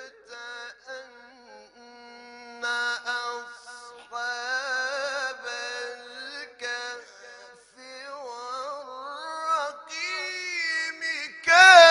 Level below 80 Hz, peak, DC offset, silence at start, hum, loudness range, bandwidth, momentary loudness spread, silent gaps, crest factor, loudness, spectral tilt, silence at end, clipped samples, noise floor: -72 dBFS; -2 dBFS; under 0.1%; 0 s; none; 7 LU; 10.5 kHz; 16 LU; none; 24 dB; -24 LUFS; 1 dB/octave; 0 s; under 0.1%; -50 dBFS